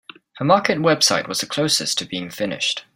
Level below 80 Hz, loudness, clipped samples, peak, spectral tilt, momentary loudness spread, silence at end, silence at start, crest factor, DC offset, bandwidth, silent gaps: -62 dBFS; -19 LUFS; under 0.1%; -2 dBFS; -3 dB/octave; 10 LU; 0.15 s; 0.35 s; 20 dB; under 0.1%; 16 kHz; none